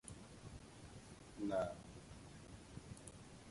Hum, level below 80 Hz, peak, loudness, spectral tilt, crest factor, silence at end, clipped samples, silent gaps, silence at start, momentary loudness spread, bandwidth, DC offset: none; -64 dBFS; -28 dBFS; -50 LUFS; -5.5 dB/octave; 22 dB; 0 s; under 0.1%; none; 0.05 s; 15 LU; 11.5 kHz; under 0.1%